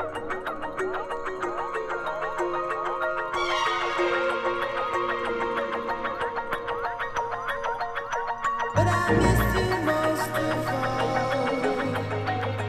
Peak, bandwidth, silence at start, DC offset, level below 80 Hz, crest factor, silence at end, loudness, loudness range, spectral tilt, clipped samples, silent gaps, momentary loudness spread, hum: -8 dBFS; 15.5 kHz; 0 s; under 0.1%; -42 dBFS; 18 dB; 0 s; -27 LUFS; 5 LU; -5.5 dB/octave; under 0.1%; none; 7 LU; none